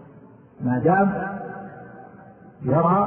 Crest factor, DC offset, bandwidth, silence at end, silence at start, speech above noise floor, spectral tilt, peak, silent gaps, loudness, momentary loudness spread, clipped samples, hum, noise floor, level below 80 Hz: 18 dB; under 0.1%; 3.4 kHz; 0 s; 0 s; 28 dB; -13.5 dB/octave; -6 dBFS; none; -22 LUFS; 23 LU; under 0.1%; none; -48 dBFS; -56 dBFS